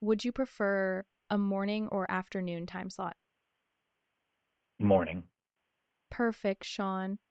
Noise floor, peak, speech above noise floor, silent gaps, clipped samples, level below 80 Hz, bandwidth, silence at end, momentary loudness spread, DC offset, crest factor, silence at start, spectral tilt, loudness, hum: -85 dBFS; -14 dBFS; 53 dB; none; under 0.1%; -64 dBFS; 8.2 kHz; 0.15 s; 11 LU; under 0.1%; 22 dB; 0 s; -6.5 dB/octave; -33 LUFS; none